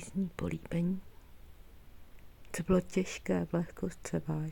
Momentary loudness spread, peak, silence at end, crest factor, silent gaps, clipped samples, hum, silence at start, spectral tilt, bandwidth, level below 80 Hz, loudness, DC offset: 10 LU; -16 dBFS; 0 s; 18 dB; none; under 0.1%; none; 0 s; -6.5 dB/octave; 17 kHz; -52 dBFS; -35 LUFS; under 0.1%